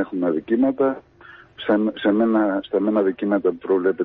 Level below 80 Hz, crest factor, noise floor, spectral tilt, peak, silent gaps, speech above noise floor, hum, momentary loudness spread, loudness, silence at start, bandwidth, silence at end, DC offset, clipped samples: -60 dBFS; 14 dB; -47 dBFS; -10 dB/octave; -6 dBFS; none; 27 dB; none; 4 LU; -21 LUFS; 0 s; 4.1 kHz; 0 s; under 0.1%; under 0.1%